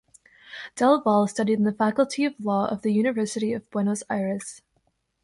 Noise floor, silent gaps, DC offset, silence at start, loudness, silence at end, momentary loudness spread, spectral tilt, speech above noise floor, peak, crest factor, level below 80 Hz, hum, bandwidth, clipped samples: -71 dBFS; none; under 0.1%; 0.45 s; -24 LUFS; 0.65 s; 12 LU; -5.5 dB/octave; 47 dB; -6 dBFS; 18 dB; -66 dBFS; none; 11.5 kHz; under 0.1%